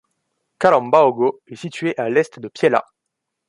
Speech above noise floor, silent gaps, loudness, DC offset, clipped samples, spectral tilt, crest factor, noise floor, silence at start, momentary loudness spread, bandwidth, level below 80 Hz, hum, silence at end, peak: 61 dB; none; -18 LUFS; under 0.1%; under 0.1%; -6 dB/octave; 18 dB; -79 dBFS; 0.6 s; 12 LU; 11.5 kHz; -64 dBFS; none; 0.65 s; -2 dBFS